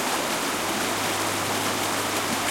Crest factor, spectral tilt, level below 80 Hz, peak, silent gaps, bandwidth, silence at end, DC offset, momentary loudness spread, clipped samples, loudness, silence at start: 14 dB; -2 dB/octave; -56 dBFS; -12 dBFS; none; 16.5 kHz; 0 s; under 0.1%; 1 LU; under 0.1%; -24 LUFS; 0 s